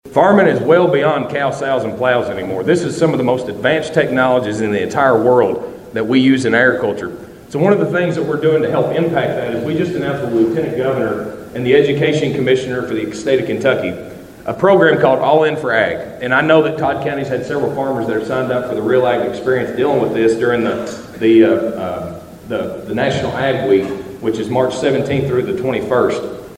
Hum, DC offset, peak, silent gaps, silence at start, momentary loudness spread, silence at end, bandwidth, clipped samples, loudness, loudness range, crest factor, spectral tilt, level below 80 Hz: none; under 0.1%; 0 dBFS; none; 0.05 s; 11 LU; 0 s; 15.5 kHz; under 0.1%; -15 LUFS; 3 LU; 14 dB; -6.5 dB/octave; -48 dBFS